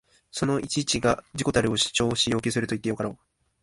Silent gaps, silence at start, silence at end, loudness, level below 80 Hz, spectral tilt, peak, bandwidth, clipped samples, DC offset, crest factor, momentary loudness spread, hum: none; 0.35 s; 0.45 s; -25 LUFS; -50 dBFS; -4 dB/octave; -8 dBFS; 11.5 kHz; under 0.1%; under 0.1%; 20 dB; 7 LU; none